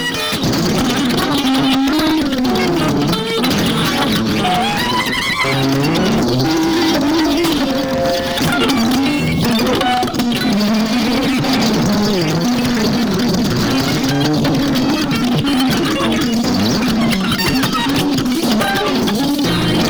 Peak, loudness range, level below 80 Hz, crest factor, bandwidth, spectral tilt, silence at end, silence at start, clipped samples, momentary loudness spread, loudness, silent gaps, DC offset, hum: -2 dBFS; 0 LU; -36 dBFS; 12 dB; over 20 kHz; -4.5 dB/octave; 0 s; 0 s; under 0.1%; 2 LU; -15 LUFS; none; under 0.1%; none